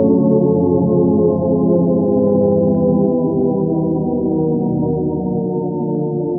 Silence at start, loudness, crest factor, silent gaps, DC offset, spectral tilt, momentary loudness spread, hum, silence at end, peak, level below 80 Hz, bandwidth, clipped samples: 0 s; -16 LUFS; 12 dB; none; under 0.1%; -15.5 dB/octave; 6 LU; none; 0 s; -2 dBFS; -44 dBFS; 1.6 kHz; under 0.1%